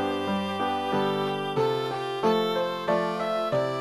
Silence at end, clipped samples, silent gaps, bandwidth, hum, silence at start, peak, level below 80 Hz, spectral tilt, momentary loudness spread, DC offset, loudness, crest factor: 0 s; under 0.1%; none; 13.5 kHz; none; 0 s; -12 dBFS; -66 dBFS; -6 dB/octave; 3 LU; under 0.1%; -27 LUFS; 14 dB